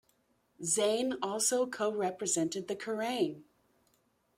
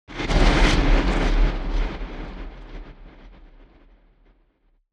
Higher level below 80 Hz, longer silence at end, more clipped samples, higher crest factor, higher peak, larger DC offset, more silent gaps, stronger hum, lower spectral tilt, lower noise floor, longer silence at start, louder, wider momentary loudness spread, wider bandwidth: second, -78 dBFS vs -24 dBFS; second, 0.95 s vs 1.65 s; neither; about the same, 18 dB vs 18 dB; second, -16 dBFS vs -4 dBFS; neither; neither; neither; second, -2.5 dB/octave vs -5.5 dB/octave; first, -73 dBFS vs -63 dBFS; first, 0.6 s vs 0.1 s; second, -32 LUFS vs -22 LUFS; second, 8 LU vs 23 LU; first, 16.5 kHz vs 9.4 kHz